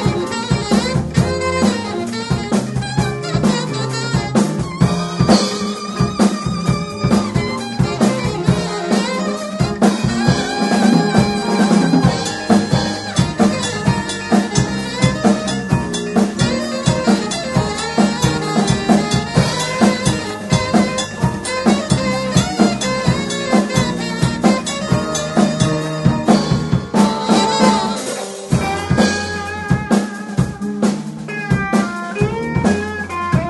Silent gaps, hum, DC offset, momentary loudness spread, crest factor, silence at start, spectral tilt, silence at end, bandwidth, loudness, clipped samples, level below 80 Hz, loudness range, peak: none; none; under 0.1%; 6 LU; 16 dB; 0 s; -5.5 dB/octave; 0 s; 11.5 kHz; -17 LUFS; under 0.1%; -36 dBFS; 3 LU; 0 dBFS